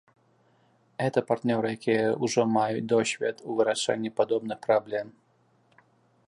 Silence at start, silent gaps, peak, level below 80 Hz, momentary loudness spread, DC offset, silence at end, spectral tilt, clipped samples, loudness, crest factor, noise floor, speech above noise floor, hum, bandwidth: 1 s; none; -8 dBFS; -74 dBFS; 6 LU; under 0.1%; 1.2 s; -5 dB/octave; under 0.1%; -27 LUFS; 20 dB; -66 dBFS; 39 dB; none; 11.5 kHz